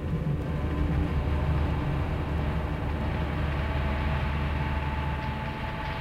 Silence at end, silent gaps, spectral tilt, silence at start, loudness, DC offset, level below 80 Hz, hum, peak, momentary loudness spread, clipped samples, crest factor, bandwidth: 0 s; none; -8 dB/octave; 0 s; -30 LUFS; under 0.1%; -32 dBFS; none; -16 dBFS; 4 LU; under 0.1%; 12 dB; 6.4 kHz